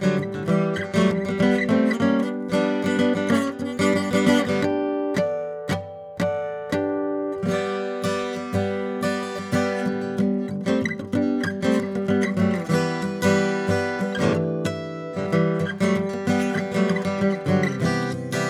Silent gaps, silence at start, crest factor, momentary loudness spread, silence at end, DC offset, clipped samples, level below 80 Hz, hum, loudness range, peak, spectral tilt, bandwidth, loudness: none; 0 s; 18 dB; 6 LU; 0 s; under 0.1%; under 0.1%; -58 dBFS; none; 4 LU; -4 dBFS; -6.5 dB/octave; 14 kHz; -23 LUFS